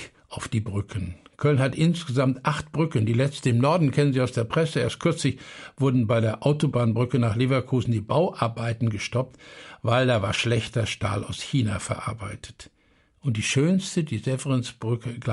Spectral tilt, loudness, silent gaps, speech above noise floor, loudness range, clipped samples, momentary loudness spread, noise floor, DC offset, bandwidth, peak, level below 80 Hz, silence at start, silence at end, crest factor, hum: -6 dB/octave; -25 LUFS; none; 38 dB; 4 LU; under 0.1%; 11 LU; -62 dBFS; under 0.1%; 11.5 kHz; -8 dBFS; -52 dBFS; 0 s; 0 s; 16 dB; none